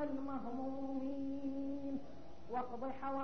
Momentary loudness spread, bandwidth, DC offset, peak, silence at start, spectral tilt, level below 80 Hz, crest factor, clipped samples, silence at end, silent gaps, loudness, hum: 4 LU; 6.4 kHz; 0.5%; -28 dBFS; 0 s; -6.5 dB/octave; -66 dBFS; 12 dB; under 0.1%; 0 s; none; -43 LUFS; none